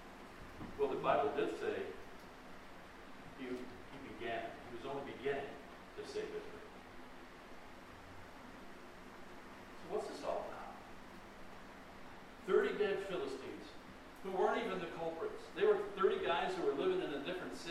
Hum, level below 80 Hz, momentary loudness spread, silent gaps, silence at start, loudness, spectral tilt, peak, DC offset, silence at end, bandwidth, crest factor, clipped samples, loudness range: none; -64 dBFS; 20 LU; none; 0 s; -40 LUFS; -5 dB/octave; -20 dBFS; under 0.1%; 0 s; 14.5 kHz; 20 dB; under 0.1%; 13 LU